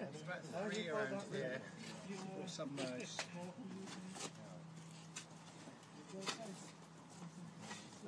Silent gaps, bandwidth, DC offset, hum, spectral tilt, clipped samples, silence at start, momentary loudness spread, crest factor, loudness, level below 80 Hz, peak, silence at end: none; 11 kHz; under 0.1%; none; -4 dB/octave; under 0.1%; 0 s; 13 LU; 22 dB; -48 LUFS; -88 dBFS; -28 dBFS; 0 s